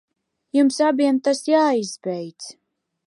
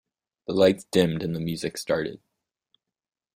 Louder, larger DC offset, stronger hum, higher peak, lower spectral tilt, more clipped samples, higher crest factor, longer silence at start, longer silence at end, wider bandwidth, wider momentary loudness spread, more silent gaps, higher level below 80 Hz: first, -20 LUFS vs -25 LUFS; neither; neither; about the same, -6 dBFS vs -6 dBFS; about the same, -4.5 dB/octave vs -5.5 dB/octave; neither; second, 16 dB vs 22 dB; about the same, 0.55 s vs 0.5 s; second, 0.55 s vs 1.2 s; second, 11.5 kHz vs 16 kHz; first, 16 LU vs 10 LU; neither; second, -78 dBFS vs -58 dBFS